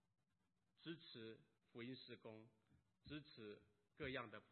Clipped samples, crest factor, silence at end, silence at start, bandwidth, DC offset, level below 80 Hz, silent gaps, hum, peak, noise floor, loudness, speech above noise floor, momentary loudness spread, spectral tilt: under 0.1%; 24 dB; 0 s; 0.8 s; 4.3 kHz; under 0.1%; -82 dBFS; none; none; -34 dBFS; -89 dBFS; -57 LUFS; 33 dB; 14 LU; -3.5 dB/octave